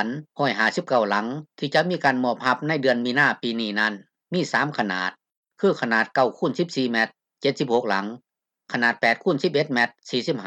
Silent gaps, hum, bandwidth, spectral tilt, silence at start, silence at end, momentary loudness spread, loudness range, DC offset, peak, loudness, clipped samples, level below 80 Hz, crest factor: 5.37-5.43 s; none; 10 kHz; -5 dB/octave; 0 s; 0 s; 7 LU; 2 LU; under 0.1%; -6 dBFS; -23 LUFS; under 0.1%; -76 dBFS; 18 dB